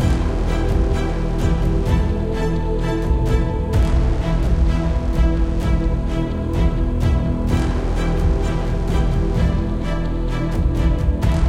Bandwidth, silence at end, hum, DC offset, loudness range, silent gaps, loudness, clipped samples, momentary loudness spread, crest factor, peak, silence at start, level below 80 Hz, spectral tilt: 10.5 kHz; 0 s; none; under 0.1%; 1 LU; none; -20 LUFS; under 0.1%; 3 LU; 12 dB; -6 dBFS; 0 s; -20 dBFS; -7.5 dB/octave